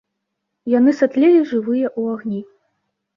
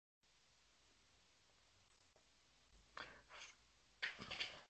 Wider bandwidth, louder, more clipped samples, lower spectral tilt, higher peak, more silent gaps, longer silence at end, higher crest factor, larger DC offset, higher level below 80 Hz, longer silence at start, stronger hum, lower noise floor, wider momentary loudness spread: second, 7.2 kHz vs 8.4 kHz; first, -17 LUFS vs -51 LUFS; neither; first, -7.5 dB/octave vs -1.5 dB/octave; first, -4 dBFS vs -30 dBFS; neither; first, 0.7 s vs 0 s; second, 14 dB vs 28 dB; neither; first, -68 dBFS vs -80 dBFS; first, 0.65 s vs 0.25 s; neither; about the same, -77 dBFS vs -75 dBFS; about the same, 14 LU vs 14 LU